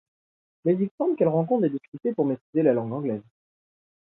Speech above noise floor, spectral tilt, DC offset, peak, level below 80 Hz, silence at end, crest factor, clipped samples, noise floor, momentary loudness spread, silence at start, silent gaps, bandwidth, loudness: over 66 dB; -13 dB/octave; under 0.1%; -8 dBFS; -74 dBFS; 0.95 s; 18 dB; under 0.1%; under -90 dBFS; 8 LU; 0.65 s; 0.91-0.98 s, 1.88-1.92 s, 2.41-2.53 s; 4 kHz; -25 LUFS